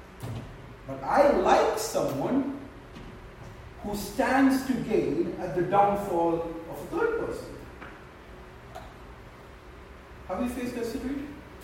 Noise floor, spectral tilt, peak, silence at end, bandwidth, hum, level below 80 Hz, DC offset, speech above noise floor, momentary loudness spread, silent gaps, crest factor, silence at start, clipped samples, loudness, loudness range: -47 dBFS; -5.5 dB/octave; -8 dBFS; 0 s; 16 kHz; none; -50 dBFS; under 0.1%; 21 dB; 24 LU; none; 20 dB; 0 s; under 0.1%; -27 LUFS; 11 LU